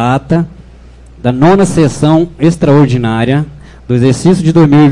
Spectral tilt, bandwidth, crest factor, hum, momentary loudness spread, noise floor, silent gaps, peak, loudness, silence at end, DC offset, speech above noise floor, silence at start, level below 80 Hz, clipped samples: -7.5 dB/octave; 11.5 kHz; 8 dB; none; 8 LU; -34 dBFS; none; 0 dBFS; -9 LUFS; 0 s; under 0.1%; 27 dB; 0 s; -34 dBFS; under 0.1%